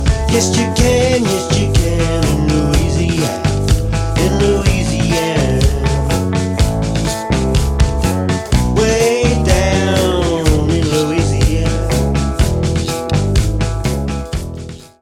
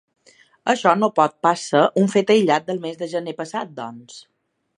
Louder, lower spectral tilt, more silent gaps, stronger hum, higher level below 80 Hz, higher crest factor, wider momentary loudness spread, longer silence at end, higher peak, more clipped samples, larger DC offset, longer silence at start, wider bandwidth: first, -15 LUFS vs -19 LUFS; about the same, -5.5 dB/octave vs -5 dB/octave; neither; neither; first, -20 dBFS vs -72 dBFS; second, 14 dB vs 20 dB; second, 5 LU vs 13 LU; second, 0.15 s vs 0.6 s; about the same, 0 dBFS vs 0 dBFS; neither; neither; second, 0 s vs 0.65 s; first, 16 kHz vs 11 kHz